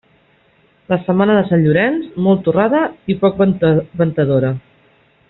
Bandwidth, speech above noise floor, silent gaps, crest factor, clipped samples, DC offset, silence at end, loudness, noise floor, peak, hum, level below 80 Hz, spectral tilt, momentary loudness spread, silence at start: 4.1 kHz; 40 dB; none; 14 dB; under 0.1%; under 0.1%; 0.7 s; -15 LUFS; -54 dBFS; -2 dBFS; none; -50 dBFS; -7 dB/octave; 7 LU; 0.9 s